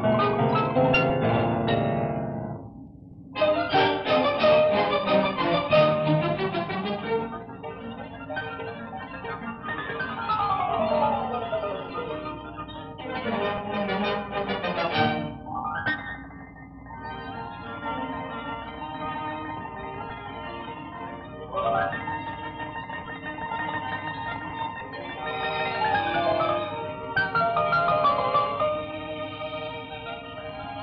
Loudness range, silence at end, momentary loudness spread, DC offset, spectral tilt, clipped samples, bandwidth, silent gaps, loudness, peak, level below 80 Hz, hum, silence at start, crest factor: 11 LU; 0 s; 15 LU; under 0.1%; -8.5 dB/octave; under 0.1%; 6 kHz; none; -27 LUFS; -8 dBFS; -52 dBFS; none; 0 s; 18 dB